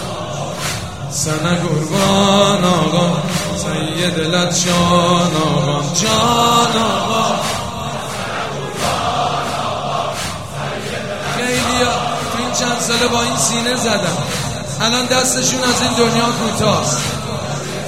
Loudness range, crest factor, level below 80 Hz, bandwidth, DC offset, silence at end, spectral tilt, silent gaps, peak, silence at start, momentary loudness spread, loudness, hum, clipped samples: 5 LU; 16 dB; -42 dBFS; 16.5 kHz; 1%; 0 s; -3.5 dB/octave; none; 0 dBFS; 0 s; 10 LU; -16 LUFS; none; under 0.1%